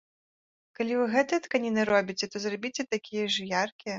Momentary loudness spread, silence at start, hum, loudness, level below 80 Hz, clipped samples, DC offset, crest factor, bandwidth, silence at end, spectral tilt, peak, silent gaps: 7 LU; 0.8 s; none; -28 LUFS; -70 dBFS; under 0.1%; under 0.1%; 20 dB; 7.8 kHz; 0 s; -3.5 dB/octave; -10 dBFS; 3.72-3.79 s